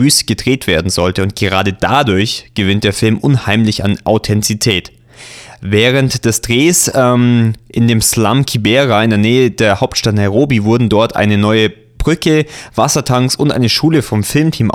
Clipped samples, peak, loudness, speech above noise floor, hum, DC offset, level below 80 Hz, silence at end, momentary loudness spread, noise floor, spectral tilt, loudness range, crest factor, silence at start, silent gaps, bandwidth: under 0.1%; 0 dBFS; -12 LUFS; 23 dB; none; under 0.1%; -34 dBFS; 0 s; 5 LU; -35 dBFS; -4.5 dB/octave; 3 LU; 12 dB; 0 s; none; 17 kHz